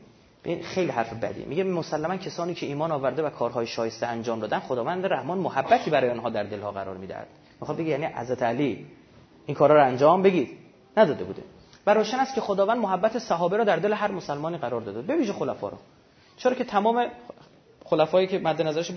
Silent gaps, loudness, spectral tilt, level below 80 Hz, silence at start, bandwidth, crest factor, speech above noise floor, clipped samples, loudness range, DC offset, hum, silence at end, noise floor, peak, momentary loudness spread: none; -25 LUFS; -6 dB/octave; -64 dBFS; 0.45 s; 6.6 kHz; 20 dB; 26 dB; under 0.1%; 6 LU; under 0.1%; none; 0 s; -51 dBFS; -6 dBFS; 12 LU